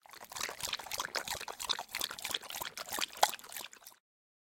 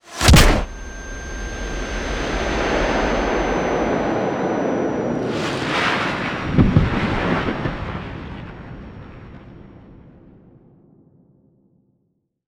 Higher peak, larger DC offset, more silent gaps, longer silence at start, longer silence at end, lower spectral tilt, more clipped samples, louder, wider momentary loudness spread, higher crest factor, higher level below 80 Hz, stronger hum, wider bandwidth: second, -8 dBFS vs 0 dBFS; neither; neither; about the same, 0.1 s vs 0.05 s; second, 0.5 s vs 2.5 s; second, 0.5 dB/octave vs -5 dB/octave; neither; second, -37 LUFS vs -20 LUFS; second, 13 LU vs 19 LU; first, 32 dB vs 20 dB; second, -70 dBFS vs -28 dBFS; neither; second, 17 kHz vs over 20 kHz